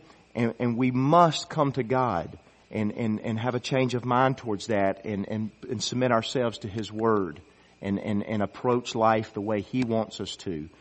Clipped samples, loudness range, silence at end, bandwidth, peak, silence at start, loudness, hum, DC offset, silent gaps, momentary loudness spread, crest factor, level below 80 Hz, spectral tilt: under 0.1%; 3 LU; 0.1 s; 8.4 kHz; -4 dBFS; 0.35 s; -27 LUFS; none; under 0.1%; none; 10 LU; 22 dB; -62 dBFS; -6 dB/octave